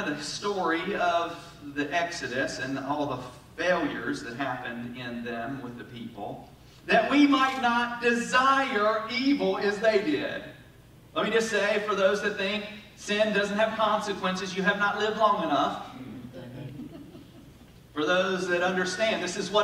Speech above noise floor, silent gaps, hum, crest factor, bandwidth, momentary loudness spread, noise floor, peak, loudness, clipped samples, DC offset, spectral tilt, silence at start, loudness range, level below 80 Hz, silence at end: 26 dB; none; none; 18 dB; 15.5 kHz; 17 LU; -52 dBFS; -8 dBFS; -27 LUFS; under 0.1%; under 0.1%; -4 dB/octave; 0 s; 7 LU; -60 dBFS; 0 s